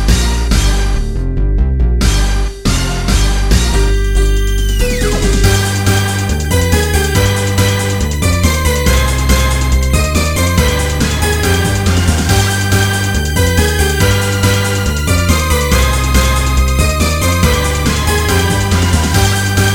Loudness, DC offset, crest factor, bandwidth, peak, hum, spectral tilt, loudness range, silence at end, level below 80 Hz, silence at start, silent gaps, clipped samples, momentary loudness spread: -13 LUFS; under 0.1%; 12 dB; 19 kHz; 0 dBFS; none; -4.5 dB/octave; 2 LU; 0 s; -14 dBFS; 0 s; none; under 0.1%; 3 LU